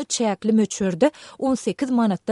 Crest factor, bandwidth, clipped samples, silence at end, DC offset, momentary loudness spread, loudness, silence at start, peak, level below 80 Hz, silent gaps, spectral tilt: 16 dB; 11.5 kHz; under 0.1%; 0 s; under 0.1%; 4 LU; -22 LUFS; 0 s; -6 dBFS; -60 dBFS; none; -5 dB/octave